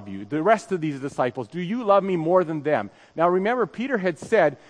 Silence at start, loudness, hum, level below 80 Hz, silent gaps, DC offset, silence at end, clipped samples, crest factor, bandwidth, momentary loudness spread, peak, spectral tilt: 0 s; -23 LUFS; none; -70 dBFS; none; under 0.1%; 0.15 s; under 0.1%; 18 dB; 10.5 kHz; 8 LU; -4 dBFS; -6.5 dB/octave